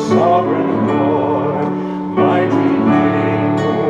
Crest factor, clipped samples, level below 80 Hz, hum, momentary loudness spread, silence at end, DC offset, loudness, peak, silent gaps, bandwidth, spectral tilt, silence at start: 12 dB; under 0.1%; -54 dBFS; none; 6 LU; 0 s; under 0.1%; -15 LUFS; -2 dBFS; none; 7.6 kHz; -8 dB/octave; 0 s